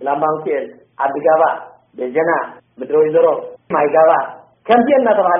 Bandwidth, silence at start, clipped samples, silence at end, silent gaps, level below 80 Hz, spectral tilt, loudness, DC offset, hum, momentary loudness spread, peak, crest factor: 3.7 kHz; 0 s; under 0.1%; 0 s; none; -66 dBFS; 0 dB/octave; -15 LUFS; under 0.1%; none; 16 LU; 0 dBFS; 16 dB